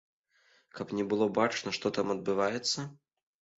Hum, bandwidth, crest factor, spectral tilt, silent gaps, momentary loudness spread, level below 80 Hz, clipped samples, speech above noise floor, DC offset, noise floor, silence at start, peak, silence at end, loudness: none; 8 kHz; 20 dB; -4 dB/octave; none; 12 LU; -70 dBFS; under 0.1%; 37 dB; under 0.1%; -68 dBFS; 0.75 s; -12 dBFS; 0.65 s; -31 LUFS